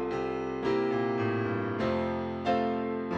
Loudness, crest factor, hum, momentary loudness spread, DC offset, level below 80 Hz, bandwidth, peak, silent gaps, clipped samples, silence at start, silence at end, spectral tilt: -30 LUFS; 14 dB; none; 4 LU; under 0.1%; -58 dBFS; 8 kHz; -16 dBFS; none; under 0.1%; 0 s; 0 s; -7.5 dB/octave